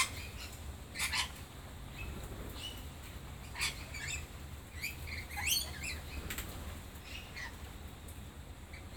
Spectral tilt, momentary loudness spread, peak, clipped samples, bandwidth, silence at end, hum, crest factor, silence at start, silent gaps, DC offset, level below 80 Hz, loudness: -2 dB/octave; 15 LU; -18 dBFS; under 0.1%; 19 kHz; 0 s; none; 24 dB; 0 s; none; under 0.1%; -50 dBFS; -41 LUFS